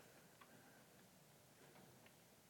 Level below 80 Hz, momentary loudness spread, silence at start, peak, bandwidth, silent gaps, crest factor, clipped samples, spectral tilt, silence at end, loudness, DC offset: under -90 dBFS; 2 LU; 0 s; -48 dBFS; 18 kHz; none; 20 dB; under 0.1%; -3.5 dB/octave; 0 s; -66 LUFS; under 0.1%